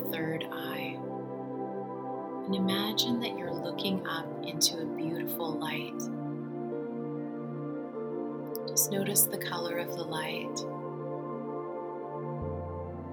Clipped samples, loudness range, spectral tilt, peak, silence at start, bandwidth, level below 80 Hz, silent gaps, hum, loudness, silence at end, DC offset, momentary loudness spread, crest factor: under 0.1%; 5 LU; -3.5 dB/octave; -10 dBFS; 0 s; 18 kHz; -68 dBFS; none; none; -33 LUFS; 0 s; under 0.1%; 11 LU; 24 dB